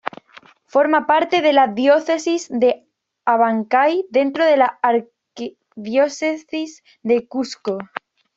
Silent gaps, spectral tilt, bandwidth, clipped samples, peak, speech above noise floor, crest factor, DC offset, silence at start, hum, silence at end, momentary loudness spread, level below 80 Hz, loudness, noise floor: none; -4 dB/octave; 8 kHz; under 0.1%; -2 dBFS; 30 dB; 16 dB; under 0.1%; 0.75 s; none; 0.5 s; 17 LU; -68 dBFS; -18 LUFS; -48 dBFS